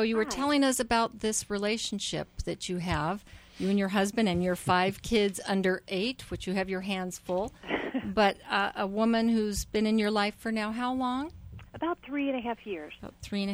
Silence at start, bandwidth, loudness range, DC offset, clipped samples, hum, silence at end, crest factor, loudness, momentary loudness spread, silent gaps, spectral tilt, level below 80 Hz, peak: 0 s; over 20 kHz; 3 LU; under 0.1%; under 0.1%; none; 0 s; 16 dB; -30 LUFS; 9 LU; none; -4.5 dB/octave; -50 dBFS; -14 dBFS